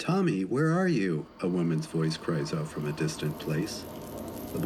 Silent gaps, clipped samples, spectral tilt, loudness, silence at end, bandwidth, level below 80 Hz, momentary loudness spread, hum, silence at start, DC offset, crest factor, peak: none; under 0.1%; -6.5 dB/octave; -30 LUFS; 0 s; 15 kHz; -58 dBFS; 12 LU; none; 0 s; under 0.1%; 14 dB; -16 dBFS